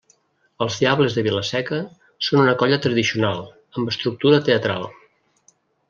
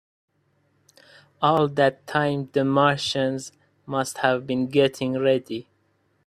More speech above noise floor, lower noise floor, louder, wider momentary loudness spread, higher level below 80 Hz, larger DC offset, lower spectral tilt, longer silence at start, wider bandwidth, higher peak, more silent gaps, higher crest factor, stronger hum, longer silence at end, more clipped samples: second, 41 dB vs 45 dB; second, -61 dBFS vs -67 dBFS; first, -20 LUFS vs -23 LUFS; first, 12 LU vs 9 LU; about the same, -62 dBFS vs -64 dBFS; neither; about the same, -5.5 dB/octave vs -5.5 dB/octave; second, 0.6 s vs 1.4 s; second, 7.4 kHz vs 14 kHz; about the same, -2 dBFS vs -4 dBFS; neither; about the same, 18 dB vs 20 dB; neither; first, 0.95 s vs 0.65 s; neither